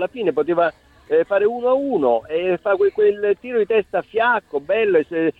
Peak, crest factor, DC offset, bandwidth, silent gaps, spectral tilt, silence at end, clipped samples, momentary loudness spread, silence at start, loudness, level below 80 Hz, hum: -4 dBFS; 14 dB; under 0.1%; 4.6 kHz; none; -7.5 dB/octave; 0.1 s; under 0.1%; 5 LU; 0 s; -19 LUFS; -58 dBFS; none